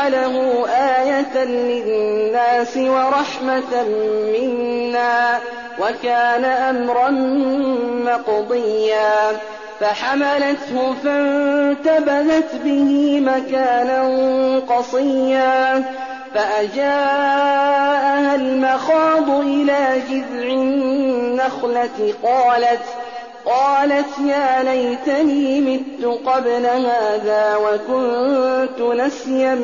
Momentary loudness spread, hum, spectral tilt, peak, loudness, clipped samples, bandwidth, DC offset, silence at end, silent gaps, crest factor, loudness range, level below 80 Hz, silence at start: 5 LU; none; -1.5 dB/octave; -6 dBFS; -17 LUFS; under 0.1%; 7.4 kHz; 0.2%; 0 s; none; 10 dB; 2 LU; -62 dBFS; 0 s